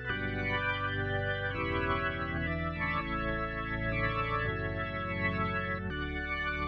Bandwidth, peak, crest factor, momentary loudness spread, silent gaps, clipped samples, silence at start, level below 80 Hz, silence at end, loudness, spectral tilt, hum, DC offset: 6.2 kHz; -20 dBFS; 14 dB; 4 LU; none; under 0.1%; 0 s; -44 dBFS; 0 s; -33 LUFS; -8 dB/octave; none; under 0.1%